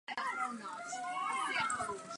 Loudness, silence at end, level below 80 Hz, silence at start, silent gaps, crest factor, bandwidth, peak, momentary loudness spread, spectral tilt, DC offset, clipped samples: -37 LUFS; 0 s; -76 dBFS; 0.1 s; none; 16 dB; 11.5 kHz; -22 dBFS; 8 LU; -1.5 dB/octave; under 0.1%; under 0.1%